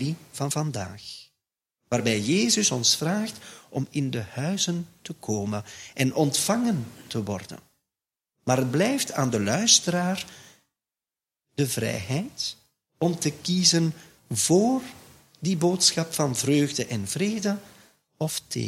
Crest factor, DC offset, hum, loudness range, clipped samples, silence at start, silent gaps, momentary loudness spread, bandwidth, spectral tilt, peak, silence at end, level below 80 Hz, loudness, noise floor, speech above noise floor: 22 dB; under 0.1%; none; 4 LU; under 0.1%; 0 s; none; 15 LU; 16.5 kHz; -3.5 dB/octave; -4 dBFS; 0 s; -64 dBFS; -25 LUFS; under -90 dBFS; over 65 dB